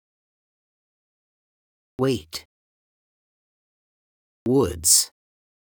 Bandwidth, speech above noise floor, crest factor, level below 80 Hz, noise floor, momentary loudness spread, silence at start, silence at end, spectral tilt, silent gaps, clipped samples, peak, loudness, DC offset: over 20 kHz; over 69 dB; 24 dB; -56 dBFS; under -90 dBFS; 18 LU; 2 s; 0.7 s; -3 dB/octave; 2.45-4.46 s; under 0.1%; -4 dBFS; -20 LUFS; under 0.1%